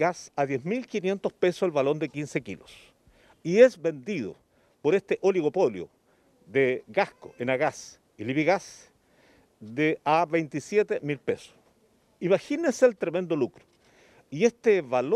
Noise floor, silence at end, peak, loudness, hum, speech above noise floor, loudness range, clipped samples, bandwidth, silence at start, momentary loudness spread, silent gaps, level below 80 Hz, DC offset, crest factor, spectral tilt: -65 dBFS; 0 s; -4 dBFS; -26 LUFS; none; 39 dB; 3 LU; under 0.1%; 12 kHz; 0 s; 12 LU; none; -70 dBFS; under 0.1%; 22 dB; -6 dB/octave